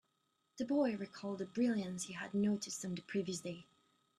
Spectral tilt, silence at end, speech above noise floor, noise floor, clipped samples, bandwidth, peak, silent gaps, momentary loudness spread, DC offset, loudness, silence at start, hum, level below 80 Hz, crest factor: -5 dB/octave; 0.55 s; 43 dB; -82 dBFS; under 0.1%; 13.5 kHz; -24 dBFS; none; 9 LU; under 0.1%; -39 LUFS; 0.55 s; none; -80 dBFS; 16 dB